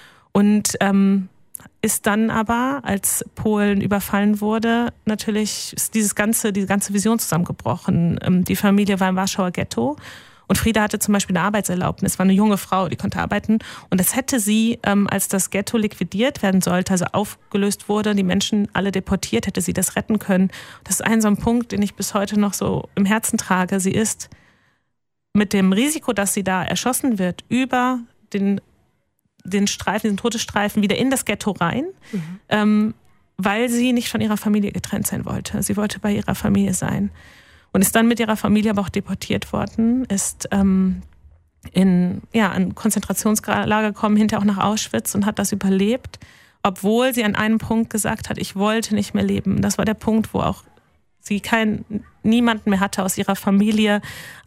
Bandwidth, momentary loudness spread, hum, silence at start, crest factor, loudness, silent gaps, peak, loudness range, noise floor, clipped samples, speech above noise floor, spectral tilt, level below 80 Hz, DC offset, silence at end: 16 kHz; 7 LU; none; 0.35 s; 18 dB; -20 LUFS; none; -2 dBFS; 2 LU; -78 dBFS; under 0.1%; 59 dB; -4.5 dB/octave; -46 dBFS; under 0.1%; 0.05 s